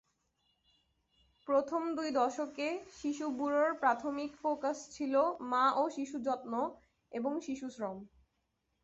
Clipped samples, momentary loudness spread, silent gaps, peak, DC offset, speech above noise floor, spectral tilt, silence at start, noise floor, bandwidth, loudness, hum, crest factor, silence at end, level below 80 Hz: under 0.1%; 10 LU; none; -18 dBFS; under 0.1%; 47 dB; -3 dB/octave; 1.45 s; -81 dBFS; 8 kHz; -35 LUFS; none; 18 dB; 0.75 s; -74 dBFS